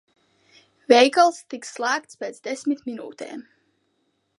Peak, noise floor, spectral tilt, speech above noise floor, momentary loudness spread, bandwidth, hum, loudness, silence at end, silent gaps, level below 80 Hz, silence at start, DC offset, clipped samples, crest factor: -2 dBFS; -71 dBFS; -2 dB/octave; 49 dB; 20 LU; 11.5 kHz; none; -21 LUFS; 1 s; none; -80 dBFS; 0.9 s; under 0.1%; under 0.1%; 22 dB